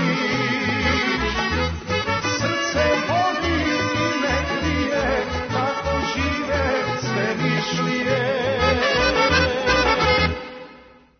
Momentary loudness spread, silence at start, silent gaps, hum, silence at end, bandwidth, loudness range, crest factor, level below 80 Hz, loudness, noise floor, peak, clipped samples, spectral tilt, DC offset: 6 LU; 0 s; none; none; 0.35 s; 6.6 kHz; 3 LU; 16 dB; -38 dBFS; -20 LUFS; -47 dBFS; -6 dBFS; under 0.1%; -4.5 dB/octave; under 0.1%